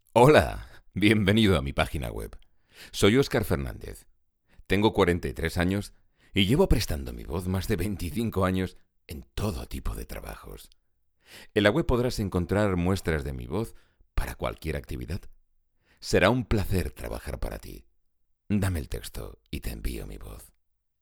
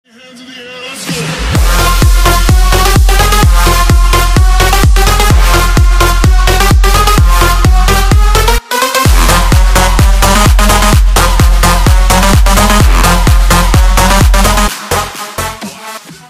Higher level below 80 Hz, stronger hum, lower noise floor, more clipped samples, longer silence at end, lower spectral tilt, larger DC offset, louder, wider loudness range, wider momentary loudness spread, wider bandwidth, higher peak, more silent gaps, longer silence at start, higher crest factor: second, -38 dBFS vs -8 dBFS; neither; first, -69 dBFS vs -33 dBFS; second, under 0.1% vs 0.1%; first, 0.55 s vs 0.15 s; first, -6 dB/octave vs -4 dB/octave; neither; second, -27 LUFS vs -8 LUFS; first, 8 LU vs 2 LU; first, 18 LU vs 9 LU; first, 19.5 kHz vs 16 kHz; second, -4 dBFS vs 0 dBFS; neither; second, 0.15 s vs 0.4 s; first, 24 dB vs 6 dB